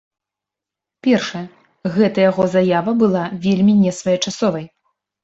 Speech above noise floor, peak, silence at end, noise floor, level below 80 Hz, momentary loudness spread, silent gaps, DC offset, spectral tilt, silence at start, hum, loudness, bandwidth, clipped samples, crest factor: 69 dB; -4 dBFS; 0.55 s; -85 dBFS; -58 dBFS; 12 LU; none; under 0.1%; -6 dB/octave; 1.05 s; none; -17 LUFS; 8 kHz; under 0.1%; 14 dB